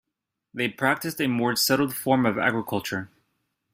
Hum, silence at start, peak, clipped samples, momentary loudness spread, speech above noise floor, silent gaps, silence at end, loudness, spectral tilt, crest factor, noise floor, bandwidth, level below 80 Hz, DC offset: none; 0.55 s; -6 dBFS; under 0.1%; 11 LU; 59 dB; none; 0.65 s; -24 LUFS; -4 dB/octave; 20 dB; -84 dBFS; 16 kHz; -64 dBFS; under 0.1%